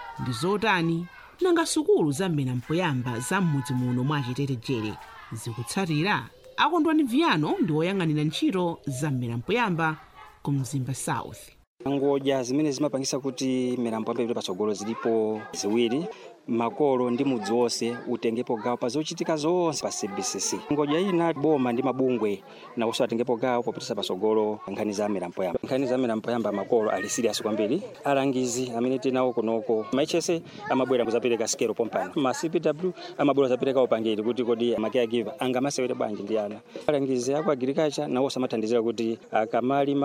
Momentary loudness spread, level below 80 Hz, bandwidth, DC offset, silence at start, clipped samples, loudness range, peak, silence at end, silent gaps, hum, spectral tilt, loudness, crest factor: 7 LU; -64 dBFS; 16 kHz; under 0.1%; 0 s; under 0.1%; 3 LU; -6 dBFS; 0 s; 11.67-11.77 s; none; -5 dB/octave; -26 LUFS; 20 dB